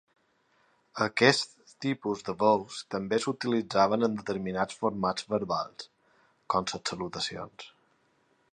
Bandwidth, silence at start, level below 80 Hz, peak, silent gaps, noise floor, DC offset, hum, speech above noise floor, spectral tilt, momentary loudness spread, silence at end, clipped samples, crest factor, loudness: 11 kHz; 0.95 s; -66 dBFS; -6 dBFS; none; -69 dBFS; under 0.1%; none; 40 dB; -4.5 dB/octave; 16 LU; 0.85 s; under 0.1%; 26 dB; -29 LUFS